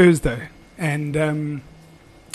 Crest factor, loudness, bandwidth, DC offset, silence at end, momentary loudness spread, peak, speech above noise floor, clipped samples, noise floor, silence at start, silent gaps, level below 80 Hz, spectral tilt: 18 dB; -22 LUFS; 13 kHz; under 0.1%; 0.75 s; 13 LU; -4 dBFS; 28 dB; under 0.1%; -47 dBFS; 0 s; none; -40 dBFS; -6.5 dB/octave